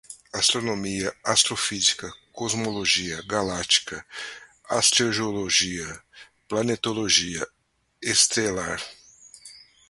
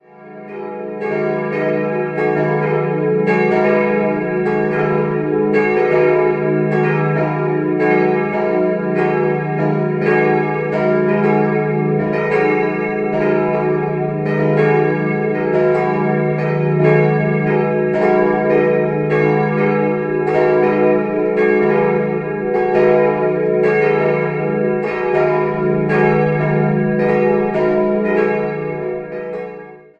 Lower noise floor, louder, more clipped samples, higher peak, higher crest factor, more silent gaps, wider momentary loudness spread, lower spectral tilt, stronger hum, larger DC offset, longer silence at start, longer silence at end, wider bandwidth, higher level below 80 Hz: first, -50 dBFS vs -35 dBFS; second, -23 LUFS vs -16 LUFS; neither; about the same, -2 dBFS vs 0 dBFS; first, 24 dB vs 14 dB; neither; first, 17 LU vs 5 LU; second, -1.5 dB/octave vs -9.5 dB/octave; neither; neither; about the same, 0.1 s vs 0.2 s; about the same, 0.3 s vs 0.2 s; first, 12 kHz vs 6.2 kHz; about the same, -56 dBFS vs -52 dBFS